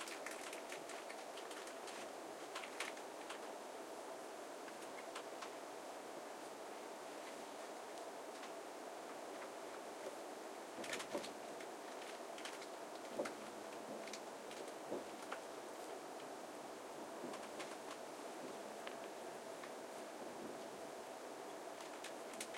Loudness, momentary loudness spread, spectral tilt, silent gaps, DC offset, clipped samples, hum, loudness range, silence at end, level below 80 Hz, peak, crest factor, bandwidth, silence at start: -50 LUFS; 4 LU; -2 dB/octave; none; under 0.1%; under 0.1%; none; 2 LU; 0 s; under -90 dBFS; -28 dBFS; 22 dB; 16.5 kHz; 0 s